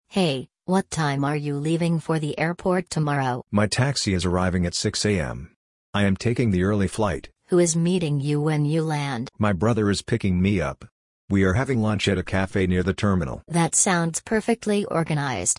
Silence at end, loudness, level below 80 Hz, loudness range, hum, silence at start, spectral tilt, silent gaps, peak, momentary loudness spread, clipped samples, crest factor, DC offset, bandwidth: 0.05 s; -23 LUFS; -48 dBFS; 2 LU; none; 0.1 s; -5 dB/octave; 5.56-5.93 s, 10.92-11.28 s; -6 dBFS; 5 LU; under 0.1%; 16 dB; under 0.1%; 11.5 kHz